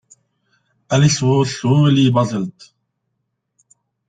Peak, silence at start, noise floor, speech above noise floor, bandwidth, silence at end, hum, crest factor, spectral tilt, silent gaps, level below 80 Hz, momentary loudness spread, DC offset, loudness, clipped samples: -2 dBFS; 0.9 s; -73 dBFS; 58 dB; 9.2 kHz; 1.6 s; none; 16 dB; -6 dB/octave; none; -52 dBFS; 9 LU; under 0.1%; -16 LUFS; under 0.1%